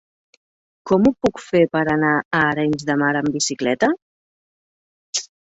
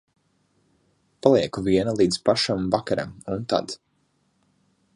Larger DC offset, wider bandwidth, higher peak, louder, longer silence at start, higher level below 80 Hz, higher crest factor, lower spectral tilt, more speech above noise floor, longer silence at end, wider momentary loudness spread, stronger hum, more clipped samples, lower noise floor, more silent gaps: neither; second, 8.4 kHz vs 11.5 kHz; about the same, -4 dBFS vs -2 dBFS; first, -19 LUFS vs -23 LUFS; second, 0.85 s vs 1.25 s; about the same, -54 dBFS vs -54 dBFS; about the same, 18 dB vs 22 dB; about the same, -4.5 dB/octave vs -5.5 dB/octave; first, over 72 dB vs 46 dB; second, 0.25 s vs 1.2 s; second, 7 LU vs 11 LU; neither; neither; first, under -90 dBFS vs -68 dBFS; first, 2.25-2.31 s, 4.02-5.13 s vs none